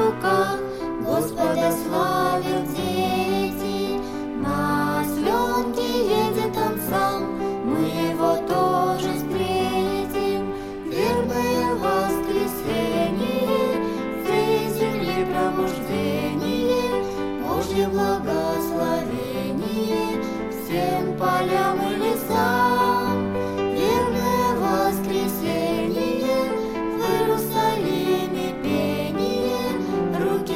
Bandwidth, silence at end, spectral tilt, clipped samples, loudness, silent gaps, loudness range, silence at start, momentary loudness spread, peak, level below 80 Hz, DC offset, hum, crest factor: 17 kHz; 0 s; -5.5 dB/octave; under 0.1%; -23 LUFS; none; 2 LU; 0 s; 5 LU; -8 dBFS; -46 dBFS; under 0.1%; none; 14 dB